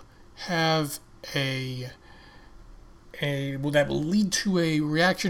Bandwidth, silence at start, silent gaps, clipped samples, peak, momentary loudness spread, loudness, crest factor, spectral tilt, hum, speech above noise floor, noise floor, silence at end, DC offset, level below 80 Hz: 18 kHz; 0 s; none; under 0.1%; -10 dBFS; 14 LU; -26 LUFS; 18 dB; -4.5 dB/octave; none; 24 dB; -49 dBFS; 0 s; under 0.1%; -52 dBFS